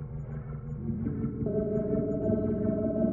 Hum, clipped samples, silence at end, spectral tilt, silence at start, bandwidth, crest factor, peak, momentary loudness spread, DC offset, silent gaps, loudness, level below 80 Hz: none; under 0.1%; 0 s; -13 dB/octave; 0 s; 2.5 kHz; 16 dB; -14 dBFS; 10 LU; under 0.1%; none; -31 LUFS; -46 dBFS